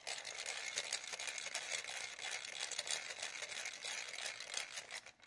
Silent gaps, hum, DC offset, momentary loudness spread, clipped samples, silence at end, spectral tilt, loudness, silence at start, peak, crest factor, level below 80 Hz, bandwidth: none; none; under 0.1%; 4 LU; under 0.1%; 0 s; 2 dB/octave; -43 LUFS; 0 s; -22 dBFS; 24 dB; -88 dBFS; 11.5 kHz